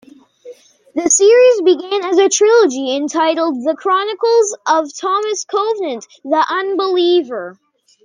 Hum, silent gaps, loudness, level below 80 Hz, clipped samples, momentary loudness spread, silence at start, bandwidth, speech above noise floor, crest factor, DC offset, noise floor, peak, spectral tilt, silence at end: none; none; -14 LUFS; -66 dBFS; under 0.1%; 11 LU; 0.45 s; 10 kHz; 25 dB; 12 dB; under 0.1%; -39 dBFS; -2 dBFS; -1 dB/octave; 0.5 s